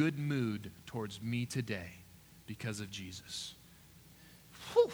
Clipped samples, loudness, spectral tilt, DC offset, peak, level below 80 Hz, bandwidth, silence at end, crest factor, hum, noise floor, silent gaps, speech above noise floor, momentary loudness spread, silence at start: under 0.1%; -39 LUFS; -5.5 dB/octave; under 0.1%; -16 dBFS; -68 dBFS; over 20 kHz; 0 s; 22 dB; none; -59 dBFS; none; 23 dB; 24 LU; 0 s